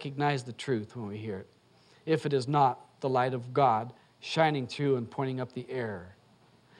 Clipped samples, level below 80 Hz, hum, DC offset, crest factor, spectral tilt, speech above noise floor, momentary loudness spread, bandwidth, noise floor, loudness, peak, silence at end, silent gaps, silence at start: under 0.1%; -74 dBFS; none; under 0.1%; 20 dB; -6.5 dB/octave; 32 dB; 13 LU; 11 kHz; -62 dBFS; -30 LUFS; -12 dBFS; 0.65 s; none; 0 s